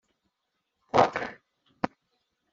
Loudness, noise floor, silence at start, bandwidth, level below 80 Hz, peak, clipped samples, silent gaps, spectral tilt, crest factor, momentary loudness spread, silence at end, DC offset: -28 LUFS; -81 dBFS; 0.95 s; 7.8 kHz; -64 dBFS; -6 dBFS; under 0.1%; none; -3.5 dB/octave; 24 dB; 12 LU; 0.65 s; under 0.1%